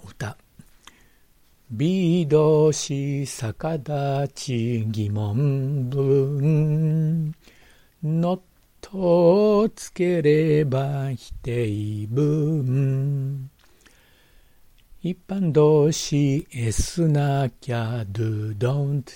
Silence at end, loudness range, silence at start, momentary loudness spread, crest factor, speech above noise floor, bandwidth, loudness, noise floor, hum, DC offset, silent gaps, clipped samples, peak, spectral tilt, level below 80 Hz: 0 s; 4 LU; 0.05 s; 12 LU; 16 dB; 36 dB; 16 kHz; -22 LUFS; -57 dBFS; none; under 0.1%; none; under 0.1%; -6 dBFS; -7 dB/octave; -46 dBFS